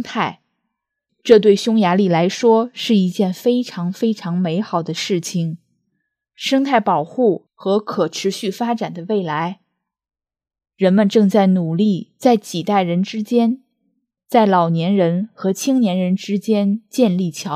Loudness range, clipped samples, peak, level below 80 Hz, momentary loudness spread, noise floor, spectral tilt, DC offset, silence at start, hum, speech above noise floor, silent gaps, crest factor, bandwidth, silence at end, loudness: 5 LU; under 0.1%; 0 dBFS; -70 dBFS; 9 LU; -77 dBFS; -6 dB/octave; under 0.1%; 0 s; none; 60 dB; none; 18 dB; 15 kHz; 0 s; -17 LUFS